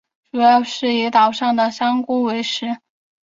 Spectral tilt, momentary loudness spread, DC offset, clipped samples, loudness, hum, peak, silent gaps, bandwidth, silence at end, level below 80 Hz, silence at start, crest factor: -3.5 dB/octave; 11 LU; under 0.1%; under 0.1%; -17 LUFS; none; -2 dBFS; none; 7.6 kHz; 0.45 s; -68 dBFS; 0.35 s; 16 dB